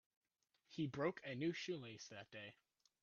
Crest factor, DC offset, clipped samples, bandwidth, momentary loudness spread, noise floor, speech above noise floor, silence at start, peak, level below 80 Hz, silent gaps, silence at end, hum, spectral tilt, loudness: 22 dB; under 0.1%; under 0.1%; 7.2 kHz; 13 LU; -83 dBFS; 37 dB; 0.7 s; -28 dBFS; -84 dBFS; none; 0.5 s; none; -4.5 dB/octave; -47 LUFS